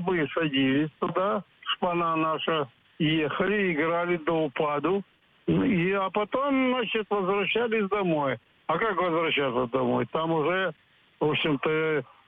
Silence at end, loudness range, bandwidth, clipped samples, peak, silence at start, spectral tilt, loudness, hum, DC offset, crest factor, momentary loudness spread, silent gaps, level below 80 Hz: 0.25 s; 1 LU; 4.6 kHz; under 0.1%; -12 dBFS; 0 s; -9 dB/octave; -26 LUFS; none; under 0.1%; 14 dB; 5 LU; none; -60 dBFS